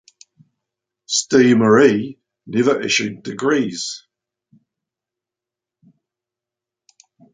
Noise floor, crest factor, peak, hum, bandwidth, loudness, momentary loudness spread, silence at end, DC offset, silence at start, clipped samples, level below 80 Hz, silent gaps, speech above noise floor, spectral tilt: -87 dBFS; 18 dB; -2 dBFS; none; 9.6 kHz; -17 LUFS; 14 LU; 3.35 s; under 0.1%; 1.1 s; under 0.1%; -64 dBFS; none; 71 dB; -4 dB/octave